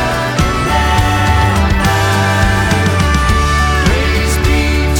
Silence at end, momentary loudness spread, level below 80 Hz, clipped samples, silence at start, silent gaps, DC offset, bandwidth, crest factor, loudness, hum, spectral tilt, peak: 0 s; 2 LU; -16 dBFS; under 0.1%; 0 s; none; under 0.1%; 18 kHz; 12 dB; -12 LUFS; none; -5 dB/octave; 0 dBFS